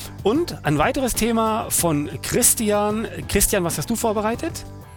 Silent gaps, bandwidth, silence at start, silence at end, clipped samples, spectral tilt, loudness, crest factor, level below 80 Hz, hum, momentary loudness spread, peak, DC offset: none; 18.5 kHz; 0 s; 0 s; under 0.1%; -4 dB/octave; -20 LUFS; 20 dB; -38 dBFS; none; 8 LU; -2 dBFS; under 0.1%